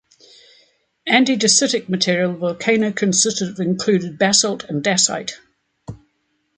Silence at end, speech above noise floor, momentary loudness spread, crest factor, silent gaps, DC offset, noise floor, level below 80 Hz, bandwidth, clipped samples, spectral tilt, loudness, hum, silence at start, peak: 0.6 s; 50 dB; 14 LU; 18 dB; none; under 0.1%; -68 dBFS; -60 dBFS; 9.6 kHz; under 0.1%; -3 dB/octave; -17 LUFS; none; 1.05 s; -2 dBFS